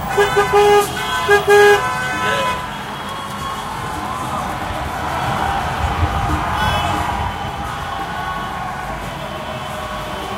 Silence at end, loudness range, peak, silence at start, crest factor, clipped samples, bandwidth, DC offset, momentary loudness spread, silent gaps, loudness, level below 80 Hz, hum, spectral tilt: 0 s; 8 LU; 0 dBFS; 0 s; 18 dB; under 0.1%; 16 kHz; under 0.1%; 13 LU; none; -18 LUFS; -32 dBFS; none; -4 dB/octave